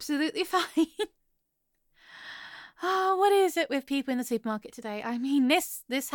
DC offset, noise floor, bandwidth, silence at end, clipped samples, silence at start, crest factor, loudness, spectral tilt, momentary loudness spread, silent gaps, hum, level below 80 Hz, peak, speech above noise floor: under 0.1%; -77 dBFS; 17.5 kHz; 0 s; under 0.1%; 0 s; 16 dB; -28 LUFS; -3 dB/octave; 19 LU; none; none; -72 dBFS; -12 dBFS; 48 dB